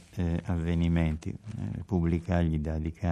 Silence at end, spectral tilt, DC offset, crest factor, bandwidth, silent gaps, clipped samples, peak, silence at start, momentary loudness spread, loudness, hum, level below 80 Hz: 0 s; -8.5 dB/octave; under 0.1%; 18 dB; 9.4 kHz; none; under 0.1%; -12 dBFS; 0 s; 9 LU; -30 LUFS; none; -42 dBFS